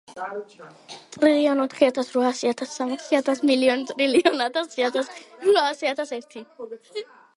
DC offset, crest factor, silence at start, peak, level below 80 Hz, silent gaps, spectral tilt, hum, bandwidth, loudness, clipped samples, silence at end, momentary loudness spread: under 0.1%; 22 dB; 0.1 s; -2 dBFS; -72 dBFS; none; -3 dB/octave; none; 11.5 kHz; -22 LUFS; under 0.1%; 0.35 s; 18 LU